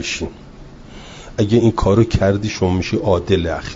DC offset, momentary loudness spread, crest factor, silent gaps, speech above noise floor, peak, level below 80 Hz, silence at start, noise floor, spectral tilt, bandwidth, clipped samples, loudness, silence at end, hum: under 0.1%; 16 LU; 16 dB; none; 21 dB; -2 dBFS; -32 dBFS; 0 s; -37 dBFS; -6.5 dB/octave; 7.8 kHz; under 0.1%; -17 LUFS; 0 s; none